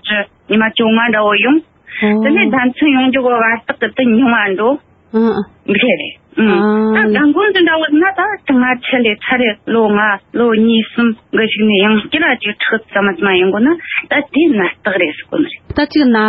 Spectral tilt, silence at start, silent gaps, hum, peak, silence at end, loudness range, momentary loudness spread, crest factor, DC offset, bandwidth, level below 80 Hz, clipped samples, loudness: -3 dB/octave; 0.05 s; none; none; 0 dBFS; 0 s; 2 LU; 6 LU; 12 dB; under 0.1%; 5.8 kHz; -48 dBFS; under 0.1%; -12 LUFS